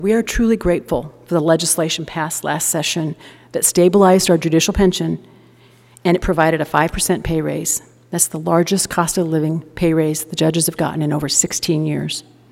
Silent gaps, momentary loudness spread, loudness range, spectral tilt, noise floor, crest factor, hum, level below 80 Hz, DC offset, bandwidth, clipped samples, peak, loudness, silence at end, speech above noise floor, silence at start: none; 9 LU; 3 LU; -4 dB/octave; -48 dBFS; 18 dB; none; -36 dBFS; under 0.1%; 16.5 kHz; under 0.1%; 0 dBFS; -17 LUFS; 0.3 s; 31 dB; 0 s